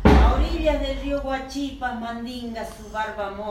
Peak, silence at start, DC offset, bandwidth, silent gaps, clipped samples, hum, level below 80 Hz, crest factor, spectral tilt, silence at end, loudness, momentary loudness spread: 0 dBFS; 0 s; under 0.1%; 12.5 kHz; none; under 0.1%; none; -26 dBFS; 22 dB; -7 dB/octave; 0 s; -25 LUFS; 12 LU